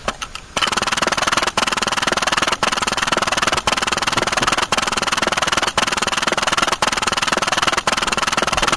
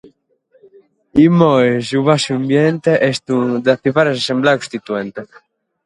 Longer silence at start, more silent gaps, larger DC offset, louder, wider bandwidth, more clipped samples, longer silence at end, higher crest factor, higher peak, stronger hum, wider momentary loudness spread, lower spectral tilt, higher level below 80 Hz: second, 0 s vs 1.15 s; neither; first, 0.2% vs under 0.1%; about the same, -17 LUFS vs -15 LUFS; about the same, 11 kHz vs 11.5 kHz; neither; second, 0 s vs 0.6 s; about the same, 18 dB vs 16 dB; about the same, 0 dBFS vs 0 dBFS; neither; second, 1 LU vs 11 LU; second, -1.5 dB/octave vs -6 dB/octave; first, -40 dBFS vs -54 dBFS